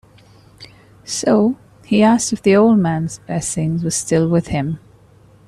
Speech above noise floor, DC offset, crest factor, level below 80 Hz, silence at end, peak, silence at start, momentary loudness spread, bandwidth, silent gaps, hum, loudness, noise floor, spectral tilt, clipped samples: 32 dB; under 0.1%; 14 dB; -48 dBFS; 0.7 s; -2 dBFS; 0.6 s; 11 LU; 13.5 kHz; none; none; -17 LUFS; -48 dBFS; -5.5 dB/octave; under 0.1%